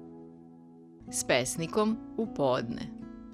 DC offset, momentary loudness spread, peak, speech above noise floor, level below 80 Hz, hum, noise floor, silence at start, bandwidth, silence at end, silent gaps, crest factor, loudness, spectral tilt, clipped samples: under 0.1%; 21 LU; -10 dBFS; 22 dB; -60 dBFS; none; -52 dBFS; 0 s; 16 kHz; 0 s; none; 22 dB; -31 LUFS; -4 dB/octave; under 0.1%